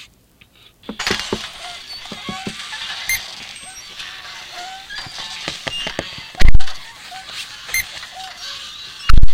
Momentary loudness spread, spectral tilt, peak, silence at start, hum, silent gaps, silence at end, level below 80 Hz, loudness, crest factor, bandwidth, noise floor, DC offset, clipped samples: 12 LU; -3 dB/octave; 0 dBFS; 1 s; none; none; 0 s; -22 dBFS; -25 LUFS; 14 dB; 15.5 kHz; -51 dBFS; under 0.1%; 1%